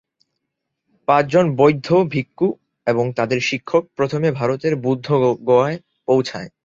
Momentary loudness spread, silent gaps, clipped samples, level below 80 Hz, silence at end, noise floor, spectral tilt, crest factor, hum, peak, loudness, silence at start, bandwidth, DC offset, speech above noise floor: 7 LU; none; under 0.1%; -58 dBFS; 0.15 s; -78 dBFS; -6.5 dB/octave; 18 dB; none; -2 dBFS; -19 LUFS; 1.1 s; 7.6 kHz; under 0.1%; 60 dB